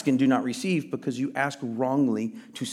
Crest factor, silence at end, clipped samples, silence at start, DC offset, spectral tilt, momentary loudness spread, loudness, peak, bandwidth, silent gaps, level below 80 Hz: 16 dB; 0 s; under 0.1%; 0 s; under 0.1%; -5.5 dB/octave; 9 LU; -27 LUFS; -10 dBFS; 13 kHz; none; -80 dBFS